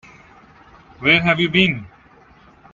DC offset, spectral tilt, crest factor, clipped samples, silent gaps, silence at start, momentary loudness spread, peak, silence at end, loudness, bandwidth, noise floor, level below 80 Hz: under 0.1%; -6 dB/octave; 22 dB; under 0.1%; none; 1 s; 7 LU; 0 dBFS; 0.85 s; -16 LUFS; 7.6 kHz; -49 dBFS; -50 dBFS